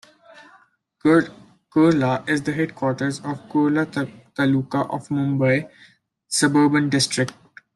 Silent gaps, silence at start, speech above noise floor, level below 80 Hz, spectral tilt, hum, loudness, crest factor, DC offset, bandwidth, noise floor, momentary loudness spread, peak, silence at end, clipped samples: none; 1.05 s; 36 dB; -62 dBFS; -5 dB/octave; none; -21 LUFS; 16 dB; under 0.1%; 12.5 kHz; -56 dBFS; 9 LU; -4 dBFS; 0.45 s; under 0.1%